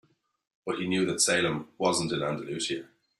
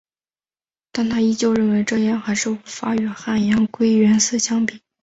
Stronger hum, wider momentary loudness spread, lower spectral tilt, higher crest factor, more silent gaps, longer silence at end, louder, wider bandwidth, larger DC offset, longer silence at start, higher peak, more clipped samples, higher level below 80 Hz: neither; about the same, 11 LU vs 9 LU; about the same, -3 dB/octave vs -4 dB/octave; first, 20 dB vs 14 dB; neither; about the same, 0.35 s vs 0.25 s; second, -28 LUFS vs -19 LUFS; first, 13.5 kHz vs 8 kHz; neither; second, 0.65 s vs 0.95 s; second, -10 dBFS vs -6 dBFS; neither; second, -66 dBFS vs -56 dBFS